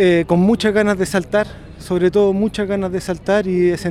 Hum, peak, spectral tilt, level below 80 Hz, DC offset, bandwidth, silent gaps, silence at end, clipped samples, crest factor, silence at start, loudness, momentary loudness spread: none; -2 dBFS; -6.5 dB/octave; -42 dBFS; under 0.1%; 14 kHz; none; 0 s; under 0.1%; 14 dB; 0 s; -17 LUFS; 8 LU